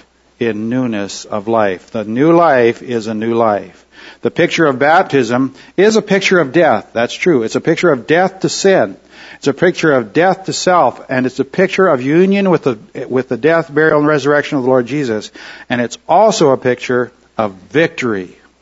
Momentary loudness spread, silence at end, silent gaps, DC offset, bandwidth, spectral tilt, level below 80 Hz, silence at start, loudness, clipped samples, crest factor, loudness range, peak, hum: 10 LU; 0.35 s; none; under 0.1%; 8 kHz; -5.5 dB/octave; -56 dBFS; 0.4 s; -13 LUFS; under 0.1%; 14 dB; 2 LU; 0 dBFS; none